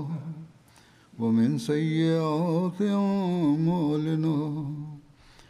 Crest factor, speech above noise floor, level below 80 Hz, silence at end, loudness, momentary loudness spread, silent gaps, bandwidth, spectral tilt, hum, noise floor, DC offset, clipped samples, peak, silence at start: 14 dB; 31 dB; -64 dBFS; 0.5 s; -26 LUFS; 12 LU; none; 12 kHz; -8 dB/octave; none; -57 dBFS; under 0.1%; under 0.1%; -14 dBFS; 0 s